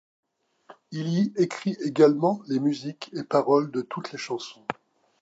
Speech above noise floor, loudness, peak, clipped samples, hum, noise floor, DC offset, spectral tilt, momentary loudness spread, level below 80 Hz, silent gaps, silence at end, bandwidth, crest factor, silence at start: 29 dB; -25 LUFS; -6 dBFS; under 0.1%; none; -54 dBFS; under 0.1%; -6.5 dB/octave; 16 LU; -78 dBFS; none; 0.5 s; 8 kHz; 20 dB; 0.7 s